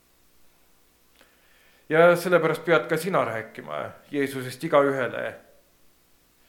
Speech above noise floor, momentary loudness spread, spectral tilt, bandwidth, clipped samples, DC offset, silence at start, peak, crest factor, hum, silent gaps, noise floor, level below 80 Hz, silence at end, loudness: 38 dB; 16 LU; -5.5 dB/octave; 17.5 kHz; under 0.1%; under 0.1%; 1.9 s; -4 dBFS; 22 dB; 60 Hz at -60 dBFS; none; -61 dBFS; -70 dBFS; 1.1 s; -24 LUFS